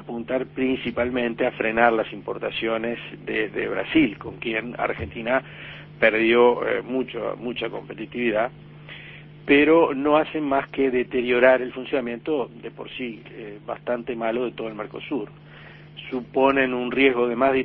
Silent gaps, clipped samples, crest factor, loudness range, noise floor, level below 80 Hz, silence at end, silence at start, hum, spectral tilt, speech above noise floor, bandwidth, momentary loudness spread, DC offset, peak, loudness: none; under 0.1%; 20 dB; 9 LU; -44 dBFS; -54 dBFS; 0 s; 0 s; none; -9 dB/octave; 21 dB; 4.8 kHz; 17 LU; under 0.1%; -2 dBFS; -23 LUFS